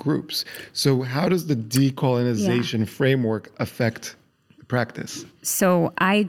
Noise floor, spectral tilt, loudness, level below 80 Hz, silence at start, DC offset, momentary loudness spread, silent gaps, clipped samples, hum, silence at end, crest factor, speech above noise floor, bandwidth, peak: -54 dBFS; -5 dB/octave; -23 LUFS; -64 dBFS; 0 s; under 0.1%; 10 LU; none; under 0.1%; none; 0 s; 18 dB; 32 dB; 17 kHz; -4 dBFS